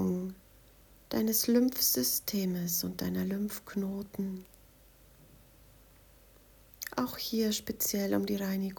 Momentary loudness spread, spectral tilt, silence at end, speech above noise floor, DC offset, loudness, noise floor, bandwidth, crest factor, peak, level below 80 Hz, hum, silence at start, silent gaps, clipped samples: 12 LU; -4 dB/octave; 0 s; 28 dB; under 0.1%; -31 LUFS; -59 dBFS; over 20 kHz; 18 dB; -16 dBFS; -62 dBFS; none; 0 s; none; under 0.1%